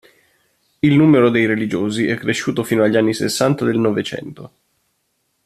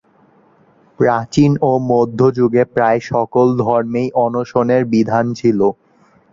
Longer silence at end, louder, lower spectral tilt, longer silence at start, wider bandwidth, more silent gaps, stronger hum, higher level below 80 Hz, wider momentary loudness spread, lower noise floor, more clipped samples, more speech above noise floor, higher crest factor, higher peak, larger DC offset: first, 1 s vs 0.6 s; about the same, -16 LUFS vs -15 LUFS; second, -6 dB/octave vs -8 dB/octave; second, 0.85 s vs 1 s; first, 14.5 kHz vs 7.6 kHz; neither; neither; about the same, -56 dBFS vs -52 dBFS; first, 9 LU vs 4 LU; first, -68 dBFS vs -52 dBFS; neither; first, 52 dB vs 38 dB; about the same, 16 dB vs 14 dB; about the same, -2 dBFS vs 0 dBFS; neither